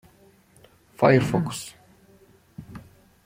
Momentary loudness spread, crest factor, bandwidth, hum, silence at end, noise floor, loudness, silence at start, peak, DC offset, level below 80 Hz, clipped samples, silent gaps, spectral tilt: 26 LU; 22 dB; 16 kHz; none; 0.45 s; -57 dBFS; -22 LUFS; 1 s; -4 dBFS; under 0.1%; -56 dBFS; under 0.1%; none; -6.5 dB/octave